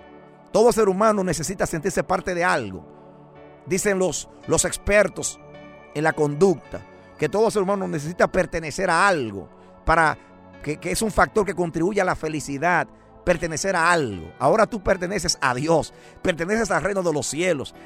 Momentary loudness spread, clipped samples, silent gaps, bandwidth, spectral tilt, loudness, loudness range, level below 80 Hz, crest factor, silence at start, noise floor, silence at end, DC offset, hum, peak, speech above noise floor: 11 LU; under 0.1%; none; 16 kHz; -4 dB/octave; -22 LUFS; 2 LU; -42 dBFS; 20 dB; 0.05 s; -46 dBFS; 0 s; under 0.1%; none; -2 dBFS; 25 dB